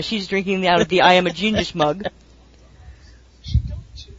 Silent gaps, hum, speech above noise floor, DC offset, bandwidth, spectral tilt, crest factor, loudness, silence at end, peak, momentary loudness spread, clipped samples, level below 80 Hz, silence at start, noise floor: none; none; 30 dB; under 0.1%; 7.8 kHz; -5 dB/octave; 20 dB; -18 LUFS; 0 s; 0 dBFS; 18 LU; under 0.1%; -34 dBFS; 0 s; -48 dBFS